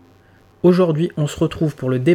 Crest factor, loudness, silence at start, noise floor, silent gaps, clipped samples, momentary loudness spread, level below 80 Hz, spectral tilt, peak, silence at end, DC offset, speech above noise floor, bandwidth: 14 dB; -18 LUFS; 0.65 s; -51 dBFS; none; under 0.1%; 6 LU; -48 dBFS; -7.5 dB/octave; -4 dBFS; 0 s; under 0.1%; 34 dB; 15 kHz